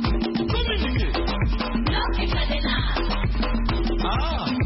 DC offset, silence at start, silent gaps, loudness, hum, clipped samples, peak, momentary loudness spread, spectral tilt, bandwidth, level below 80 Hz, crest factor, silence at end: under 0.1%; 0 s; none; -24 LUFS; none; under 0.1%; -10 dBFS; 2 LU; -9.5 dB/octave; 5.8 kHz; -26 dBFS; 14 dB; 0 s